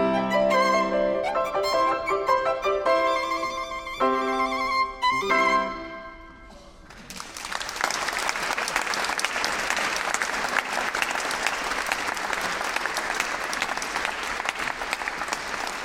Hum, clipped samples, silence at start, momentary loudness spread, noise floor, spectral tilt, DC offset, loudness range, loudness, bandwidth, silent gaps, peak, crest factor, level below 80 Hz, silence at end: none; under 0.1%; 0 s; 8 LU; -46 dBFS; -2 dB/octave; under 0.1%; 4 LU; -25 LUFS; 17.5 kHz; none; -4 dBFS; 22 dB; -52 dBFS; 0 s